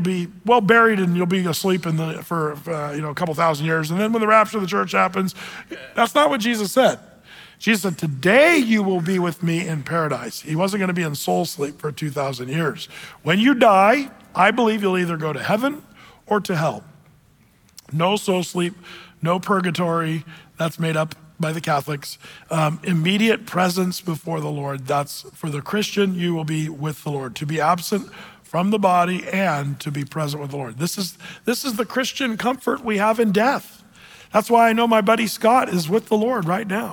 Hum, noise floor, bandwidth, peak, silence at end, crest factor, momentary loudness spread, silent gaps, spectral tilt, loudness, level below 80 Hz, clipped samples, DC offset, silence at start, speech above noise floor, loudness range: none; -55 dBFS; 19.5 kHz; -4 dBFS; 0 s; 18 dB; 12 LU; none; -5.5 dB/octave; -20 LUFS; -62 dBFS; under 0.1%; under 0.1%; 0 s; 35 dB; 6 LU